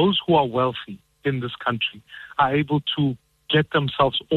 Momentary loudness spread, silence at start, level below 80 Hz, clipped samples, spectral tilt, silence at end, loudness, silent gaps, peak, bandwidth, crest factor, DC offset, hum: 13 LU; 0 s; -52 dBFS; under 0.1%; -8 dB/octave; 0 s; -22 LUFS; none; -6 dBFS; 4.3 kHz; 16 dB; under 0.1%; none